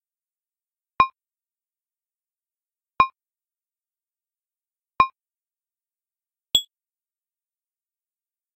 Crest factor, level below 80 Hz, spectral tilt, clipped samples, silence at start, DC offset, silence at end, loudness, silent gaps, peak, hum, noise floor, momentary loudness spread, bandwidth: 28 dB; -58 dBFS; -1 dB/octave; under 0.1%; 1 s; under 0.1%; 1.95 s; -22 LUFS; none; -2 dBFS; none; under -90 dBFS; 0 LU; 16 kHz